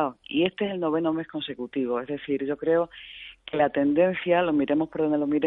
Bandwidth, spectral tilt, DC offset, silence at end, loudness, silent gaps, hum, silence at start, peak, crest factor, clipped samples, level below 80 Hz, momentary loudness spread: 4 kHz; -9.5 dB/octave; under 0.1%; 0 s; -26 LUFS; none; none; 0 s; -8 dBFS; 18 dB; under 0.1%; -62 dBFS; 10 LU